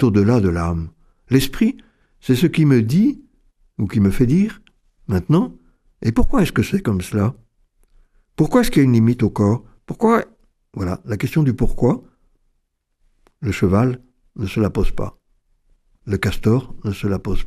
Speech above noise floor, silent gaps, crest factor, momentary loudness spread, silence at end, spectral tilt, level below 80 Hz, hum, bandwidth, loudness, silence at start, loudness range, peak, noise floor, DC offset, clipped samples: 52 dB; none; 18 dB; 15 LU; 0 s; -7.5 dB/octave; -32 dBFS; none; 14.5 kHz; -19 LUFS; 0 s; 5 LU; 0 dBFS; -69 dBFS; under 0.1%; under 0.1%